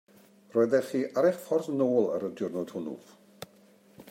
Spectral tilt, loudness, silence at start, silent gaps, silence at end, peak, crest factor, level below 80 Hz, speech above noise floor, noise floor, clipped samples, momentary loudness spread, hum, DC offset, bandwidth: -6.5 dB/octave; -29 LUFS; 0.55 s; none; 0 s; -12 dBFS; 18 dB; -80 dBFS; 31 dB; -59 dBFS; under 0.1%; 22 LU; none; under 0.1%; 16 kHz